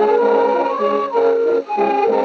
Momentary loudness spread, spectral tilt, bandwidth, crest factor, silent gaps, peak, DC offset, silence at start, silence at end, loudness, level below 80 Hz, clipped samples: 4 LU; -6 dB/octave; 6.4 kHz; 10 dB; none; -4 dBFS; under 0.1%; 0 s; 0 s; -16 LUFS; -74 dBFS; under 0.1%